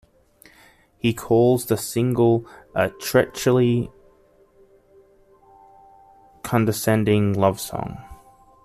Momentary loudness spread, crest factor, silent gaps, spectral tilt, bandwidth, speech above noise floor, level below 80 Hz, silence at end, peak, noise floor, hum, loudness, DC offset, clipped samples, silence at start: 11 LU; 20 dB; none; -6 dB/octave; 15 kHz; 36 dB; -52 dBFS; 0.5 s; -4 dBFS; -56 dBFS; none; -21 LUFS; under 0.1%; under 0.1%; 1.05 s